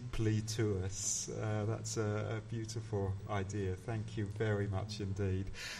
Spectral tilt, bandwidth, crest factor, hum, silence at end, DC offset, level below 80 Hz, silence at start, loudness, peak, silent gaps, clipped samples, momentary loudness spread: -5 dB/octave; 13 kHz; 14 dB; none; 0 s; under 0.1%; -54 dBFS; 0 s; -38 LUFS; -22 dBFS; none; under 0.1%; 5 LU